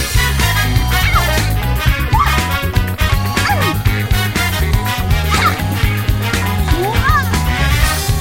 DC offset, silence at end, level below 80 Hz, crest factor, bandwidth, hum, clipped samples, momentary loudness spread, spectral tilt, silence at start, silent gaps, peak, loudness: 0.9%; 0 s; -18 dBFS; 14 dB; 16.5 kHz; none; under 0.1%; 3 LU; -4.5 dB/octave; 0 s; none; 0 dBFS; -15 LUFS